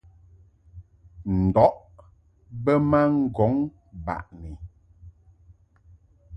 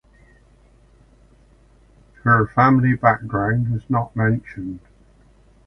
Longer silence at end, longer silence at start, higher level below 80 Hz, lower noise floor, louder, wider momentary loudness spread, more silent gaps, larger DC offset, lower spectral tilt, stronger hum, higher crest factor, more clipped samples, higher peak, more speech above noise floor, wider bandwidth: second, 0 s vs 0.9 s; second, 0.75 s vs 2.25 s; about the same, -44 dBFS vs -46 dBFS; first, -56 dBFS vs -52 dBFS; second, -23 LUFS vs -19 LUFS; first, 22 LU vs 17 LU; neither; neither; about the same, -10.5 dB/octave vs -10 dB/octave; neither; about the same, 22 dB vs 22 dB; neither; second, -4 dBFS vs 0 dBFS; about the same, 34 dB vs 34 dB; about the same, 5.8 kHz vs 5.8 kHz